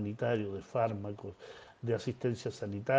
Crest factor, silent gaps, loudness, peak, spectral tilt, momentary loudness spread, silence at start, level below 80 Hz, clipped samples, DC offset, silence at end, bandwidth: 18 dB; none; -36 LUFS; -16 dBFS; -7 dB/octave; 13 LU; 0 s; -70 dBFS; under 0.1%; under 0.1%; 0 s; 9.4 kHz